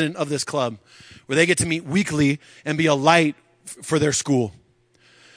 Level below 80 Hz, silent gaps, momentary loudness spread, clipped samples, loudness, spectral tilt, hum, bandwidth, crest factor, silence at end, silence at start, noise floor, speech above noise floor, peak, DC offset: -56 dBFS; none; 13 LU; under 0.1%; -21 LUFS; -4.5 dB/octave; none; 10.5 kHz; 22 dB; 0.85 s; 0 s; -58 dBFS; 37 dB; 0 dBFS; under 0.1%